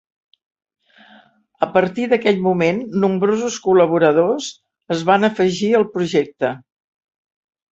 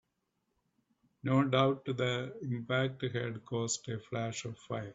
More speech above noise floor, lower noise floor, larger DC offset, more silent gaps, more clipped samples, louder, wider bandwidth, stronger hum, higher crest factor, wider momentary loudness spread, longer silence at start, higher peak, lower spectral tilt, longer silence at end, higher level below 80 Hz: second, 34 dB vs 48 dB; second, -51 dBFS vs -82 dBFS; neither; neither; neither; first, -17 LUFS vs -34 LUFS; about the same, 8 kHz vs 8 kHz; neither; about the same, 18 dB vs 20 dB; about the same, 9 LU vs 11 LU; first, 1.6 s vs 1.25 s; first, 0 dBFS vs -14 dBFS; about the same, -5.5 dB/octave vs -5 dB/octave; first, 1.15 s vs 0 s; first, -60 dBFS vs -70 dBFS